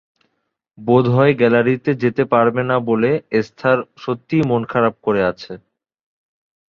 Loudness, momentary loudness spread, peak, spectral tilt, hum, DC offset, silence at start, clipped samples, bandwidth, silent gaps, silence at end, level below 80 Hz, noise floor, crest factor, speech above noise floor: -17 LUFS; 12 LU; -2 dBFS; -8.5 dB/octave; none; under 0.1%; 0.8 s; under 0.1%; 6.8 kHz; none; 1.1 s; -56 dBFS; -72 dBFS; 16 dB; 56 dB